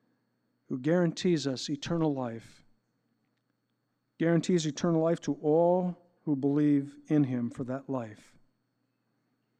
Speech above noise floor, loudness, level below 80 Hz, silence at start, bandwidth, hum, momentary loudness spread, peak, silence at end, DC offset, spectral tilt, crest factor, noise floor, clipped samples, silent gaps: 50 dB; -29 LUFS; -68 dBFS; 0.7 s; 9.4 kHz; none; 11 LU; -14 dBFS; 1.45 s; under 0.1%; -6.5 dB/octave; 16 dB; -79 dBFS; under 0.1%; none